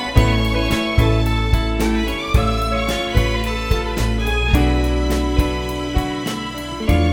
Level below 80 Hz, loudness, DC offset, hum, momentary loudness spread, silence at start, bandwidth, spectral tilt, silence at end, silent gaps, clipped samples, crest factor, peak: -22 dBFS; -19 LUFS; under 0.1%; none; 6 LU; 0 s; 17.5 kHz; -5.5 dB/octave; 0 s; none; under 0.1%; 18 dB; 0 dBFS